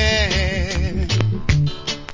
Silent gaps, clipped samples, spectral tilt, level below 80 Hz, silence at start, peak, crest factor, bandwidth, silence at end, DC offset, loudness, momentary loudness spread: none; under 0.1%; -5 dB/octave; -24 dBFS; 0 s; 0 dBFS; 18 dB; 7.6 kHz; 0 s; under 0.1%; -20 LUFS; 5 LU